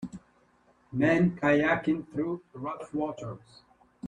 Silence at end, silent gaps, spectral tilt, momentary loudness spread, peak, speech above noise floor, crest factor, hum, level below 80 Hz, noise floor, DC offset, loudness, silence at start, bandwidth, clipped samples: 0 s; none; -7.5 dB/octave; 18 LU; -12 dBFS; 36 dB; 18 dB; none; -60 dBFS; -64 dBFS; under 0.1%; -28 LUFS; 0 s; 9.8 kHz; under 0.1%